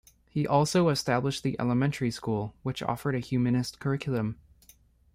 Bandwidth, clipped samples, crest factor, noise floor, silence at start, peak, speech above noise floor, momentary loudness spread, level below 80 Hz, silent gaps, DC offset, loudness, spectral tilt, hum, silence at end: 16 kHz; under 0.1%; 18 dB; -60 dBFS; 0.35 s; -10 dBFS; 32 dB; 9 LU; -56 dBFS; none; under 0.1%; -29 LUFS; -6 dB/octave; none; 0.8 s